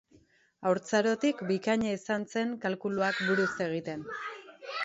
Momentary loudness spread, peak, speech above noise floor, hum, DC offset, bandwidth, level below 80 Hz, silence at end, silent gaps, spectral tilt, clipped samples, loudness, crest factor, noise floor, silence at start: 11 LU; -14 dBFS; 34 dB; none; under 0.1%; 8 kHz; -70 dBFS; 0 s; none; -5 dB/octave; under 0.1%; -31 LUFS; 18 dB; -64 dBFS; 0.6 s